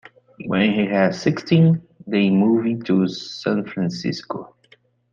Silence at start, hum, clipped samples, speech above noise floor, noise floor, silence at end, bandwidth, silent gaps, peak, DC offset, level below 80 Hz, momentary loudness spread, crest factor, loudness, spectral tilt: 0.4 s; none; under 0.1%; 37 dB; -56 dBFS; 0.65 s; 7.2 kHz; none; -4 dBFS; under 0.1%; -60 dBFS; 10 LU; 16 dB; -20 LUFS; -7 dB/octave